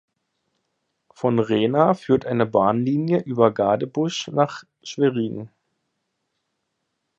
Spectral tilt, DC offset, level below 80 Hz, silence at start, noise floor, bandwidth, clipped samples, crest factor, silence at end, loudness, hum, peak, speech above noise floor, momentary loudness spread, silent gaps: -6.5 dB/octave; under 0.1%; -60 dBFS; 1.2 s; -76 dBFS; 8 kHz; under 0.1%; 20 dB; 1.7 s; -21 LUFS; none; -2 dBFS; 56 dB; 8 LU; none